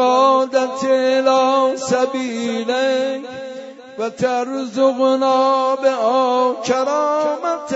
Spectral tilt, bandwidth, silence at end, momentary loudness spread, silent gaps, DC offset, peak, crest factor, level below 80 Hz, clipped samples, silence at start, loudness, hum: -4 dB/octave; 8 kHz; 0 s; 11 LU; none; under 0.1%; -2 dBFS; 14 dB; -68 dBFS; under 0.1%; 0 s; -17 LUFS; none